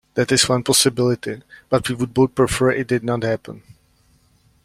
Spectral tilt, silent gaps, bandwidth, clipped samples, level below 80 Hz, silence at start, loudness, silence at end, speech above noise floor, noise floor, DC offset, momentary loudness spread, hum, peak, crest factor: -4 dB/octave; none; 16 kHz; under 0.1%; -46 dBFS; 0.15 s; -18 LUFS; 1.05 s; 39 dB; -58 dBFS; under 0.1%; 12 LU; none; -2 dBFS; 18 dB